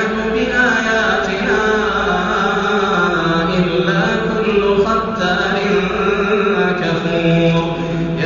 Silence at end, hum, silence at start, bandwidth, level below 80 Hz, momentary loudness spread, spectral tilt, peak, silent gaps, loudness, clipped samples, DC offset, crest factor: 0 s; none; 0 s; 7.2 kHz; -38 dBFS; 3 LU; -4 dB/octave; -2 dBFS; none; -15 LUFS; under 0.1%; under 0.1%; 12 dB